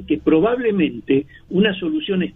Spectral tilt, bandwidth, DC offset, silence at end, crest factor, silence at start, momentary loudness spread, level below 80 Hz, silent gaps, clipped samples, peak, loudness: -9.5 dB/octave; 3.9 kHz; under 0.1%; 0.05 s; 16 dB; 0 s; 5 LU; -48 dBFS; none; under 0.1%; -4 dBFS; -19 LUFS